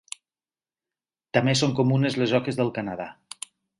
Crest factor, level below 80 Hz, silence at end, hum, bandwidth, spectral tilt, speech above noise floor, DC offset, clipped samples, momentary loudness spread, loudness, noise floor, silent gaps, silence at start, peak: 22 dB; -62 dBFS; 0.65 s; none; 11.5 kHz; -5.5 dB/octave; over 67 dB; under 0.1%; under 0.1%; 17 LU; -24 LUFS; under -90 dBFS; none; 1.35 s; -6 dBFS